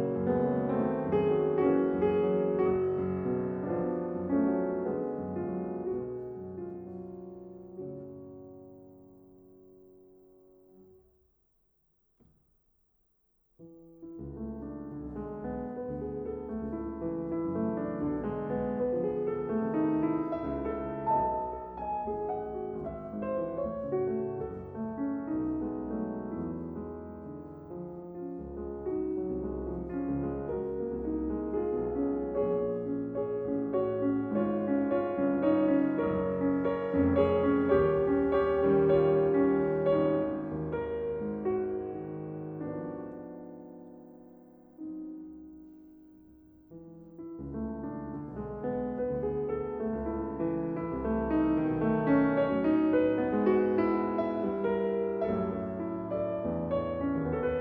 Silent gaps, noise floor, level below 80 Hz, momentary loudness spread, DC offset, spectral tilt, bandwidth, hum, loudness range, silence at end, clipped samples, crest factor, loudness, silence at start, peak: none; -73 dBFS; -52 dBFS; 16 LU; under 0.1%; -11 dB/octave; 4.3 kHz; none; 16 LU; 0 s; under 0.1%; 18 dB; -31 LUFS; 0 s; -14 dBFS